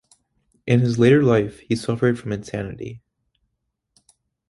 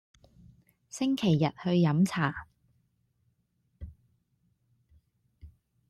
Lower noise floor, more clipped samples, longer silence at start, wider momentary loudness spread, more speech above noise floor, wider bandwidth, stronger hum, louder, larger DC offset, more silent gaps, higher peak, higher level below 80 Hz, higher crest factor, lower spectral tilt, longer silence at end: about the same, -76 dBFS vs -74 dBFS; neither; second, 0.65 s vs 0.95 s; second, 18 LU vs 24 LU; first, 57 dB vs 48 dB; second, 11.5 kHz vs 13 kHz; neither; first, -20 LUFS vs -28 LUFS; neither; neither; first, -2 dBFS vs -14 dBFS; first, -52 dBFS vs -60 dBFS; about the same, 20 dB vs 18 dB; about the same, -7.5 dB/octave vs -6.5 dB/octave; first, 1.5 s vs 0.4 s